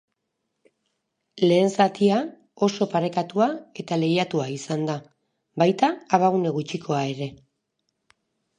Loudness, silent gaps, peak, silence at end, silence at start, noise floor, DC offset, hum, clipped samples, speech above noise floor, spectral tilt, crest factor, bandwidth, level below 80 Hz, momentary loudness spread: -23 LUFS; none; -2 dBFS; 1.25 s; 1.35 s; -78 dBFS; under 0.1%; none; under 0.1%; 56 dB; -6 dB/octave; 22 dB; 10.5 kHz; -70 dBFS; 10 LU